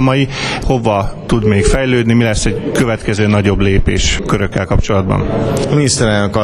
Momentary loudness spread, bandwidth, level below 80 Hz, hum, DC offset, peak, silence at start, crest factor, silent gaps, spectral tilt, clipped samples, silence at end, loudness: 4 LU; 14 kHz; -22 dBFS; none; under 0.1%; 0 dBFS; 0 s; 12 dB; none; -5.5 dB/octave; under 0.1%; 0 s; -13 LUFS